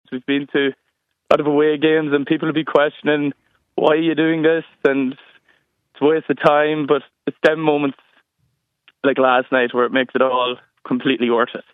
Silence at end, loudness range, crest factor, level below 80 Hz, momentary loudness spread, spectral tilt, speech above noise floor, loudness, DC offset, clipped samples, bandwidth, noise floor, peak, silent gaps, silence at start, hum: 0.15 s; 2 LU; 18 dB; -66 dBFS; 7 LU; -7 dB/octave; 51 dB; -18 LUFS; under 0.1%; under 0.1%; 6.2 kHz; -68 dBFS; 0 dBFS; none; 0.1 s; none